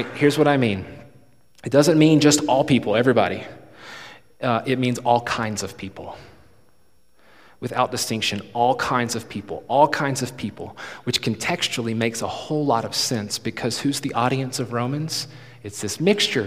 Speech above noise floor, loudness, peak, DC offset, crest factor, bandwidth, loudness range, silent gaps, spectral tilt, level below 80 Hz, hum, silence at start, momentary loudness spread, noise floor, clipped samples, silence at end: 41 dB; -21 LUFS; -2 dBFS; 0.2%; 20 dB; 15.5 kHz; 7 LU; none; -4.5 dB/octave; -58 dBFS; none; 0 s; 18 LU; -63 dBFS; under 0.1%; 0 s